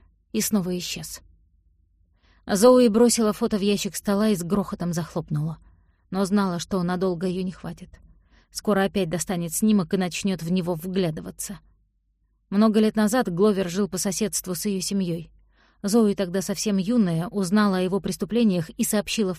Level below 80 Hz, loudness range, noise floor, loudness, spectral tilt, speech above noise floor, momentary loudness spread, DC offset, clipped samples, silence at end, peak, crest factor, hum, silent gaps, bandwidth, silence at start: -52 dBFS; 5 LU; -68 dBFS; -23 LUFS; -5 dB/octave; 45 dB; 13 LU; under 0.1%; under 0.1%; 0 s; -6 dBFS; 18 dB; none; none; 15.5 kHz; 0.35 s